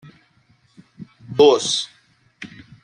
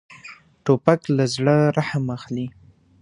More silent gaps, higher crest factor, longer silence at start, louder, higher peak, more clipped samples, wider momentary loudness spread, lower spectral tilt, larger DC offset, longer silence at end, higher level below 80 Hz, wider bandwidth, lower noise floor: neither; about the same, 20 dB vs 22 dB; first, 1 s vs 0.1 s; first, -17 LUFS vs -21 LUFS; about the same, -2 dBFS vs 0 dBFS; neither; first, 25 LU vs 20 LU; second, -3.5 dB/octave vs -6.5 dB/octave; neither; second, 0.35 s vs 0.5 s; second, -64 dBFS vs -58 dBFS; about the same, 10.5 kHz vs 10.5 kHz; first, -59 dBFS vs -45 dBFS